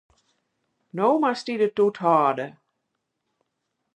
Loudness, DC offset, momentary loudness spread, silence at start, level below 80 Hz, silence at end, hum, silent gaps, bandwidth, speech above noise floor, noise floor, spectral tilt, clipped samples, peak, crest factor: -22 LUFS; under 0.1%; 13 LU; 0.95 s; -78 dBFS; 1.45 s; none; none; 10 kHz; 57 dB; -79 dBFS; -6.5 dB/octave; under 0.1%; -6 dBFS; 18 dB